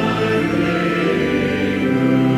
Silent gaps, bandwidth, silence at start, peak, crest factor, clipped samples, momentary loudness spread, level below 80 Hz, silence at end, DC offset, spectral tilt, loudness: none; 15.5 kHz; 0 s; -4 dBFS; 12 dB; under 0.1%; 2 LU; -42 dBFS; 0 s; under 0.1%; -7 dB/octave; -18 LUFS